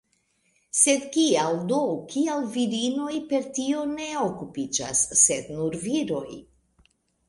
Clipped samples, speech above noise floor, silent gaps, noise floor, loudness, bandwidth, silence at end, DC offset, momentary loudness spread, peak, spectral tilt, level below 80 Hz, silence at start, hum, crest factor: under 0.1%; 44 dB; none; -69 dBFS; -24 LUFS; 11.5 kHz; 0.85 s; under 0.1%; 10 LU; -6 dBFS; -3 dB/octave; -62 dBFS; 0.75 s; none; 20 dB